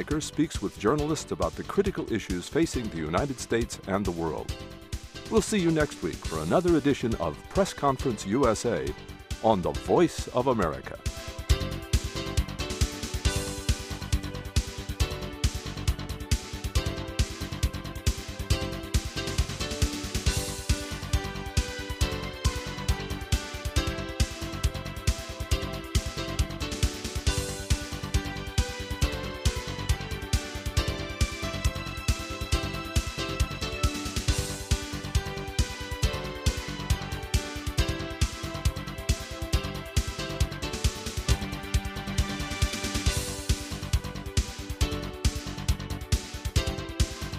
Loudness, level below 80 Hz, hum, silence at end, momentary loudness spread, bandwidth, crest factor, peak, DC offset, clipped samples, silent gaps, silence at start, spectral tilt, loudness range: -30 LUFS; -34 dBFS; none; 0 s; 6 LU; 15.5 kHz; 22 dB; -8 dBFS; under 0.1%; under 0.1%; none; 0 s; -4.5 dB/octave; 4 LU